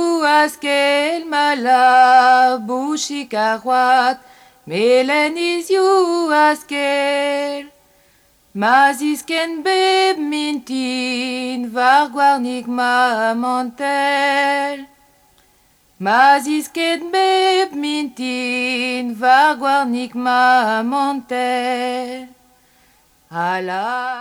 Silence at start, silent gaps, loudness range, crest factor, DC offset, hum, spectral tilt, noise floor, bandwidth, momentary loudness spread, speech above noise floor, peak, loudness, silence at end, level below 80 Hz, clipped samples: 0 s; none; 4 LU; 16 dB; under 0.1%; none; -3 dB/octave; -55 dBFS; 16.5 kHz; 9 LU; 39 dB; -2 dBFS; -16 LUFS; 0 s; -66 dBFS; under 0.1%